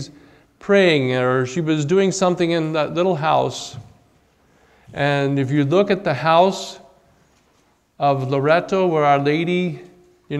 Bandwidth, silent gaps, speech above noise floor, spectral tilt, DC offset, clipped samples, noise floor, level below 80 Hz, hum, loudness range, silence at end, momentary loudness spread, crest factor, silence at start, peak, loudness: 12 kHz; none; 42 dB; -6 dB/octave; under 0.1%; under 0.1%; -60 dBFS; -60 dBFS; none; 3 LU; 0 s; 12 LU; 18 dB; 0 s; -2 dBFS; -18 LUFS